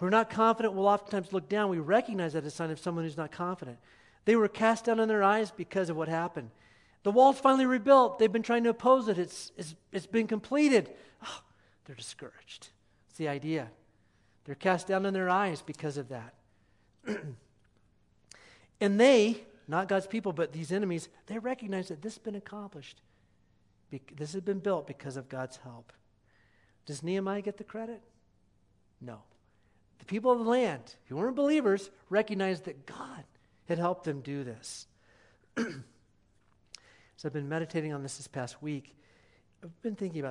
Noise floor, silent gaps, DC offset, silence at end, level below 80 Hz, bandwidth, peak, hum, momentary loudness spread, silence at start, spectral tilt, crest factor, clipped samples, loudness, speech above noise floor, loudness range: -68 dBFS; none; under 0.1%; 0 s; -74 dBFS; 11.5 kHz; -10 dBFS; none; 20 LU; 0 s; -5.5 dB/octave; 22 dB; under 0.1%; -30 LUFS; 37 dB; 14 LU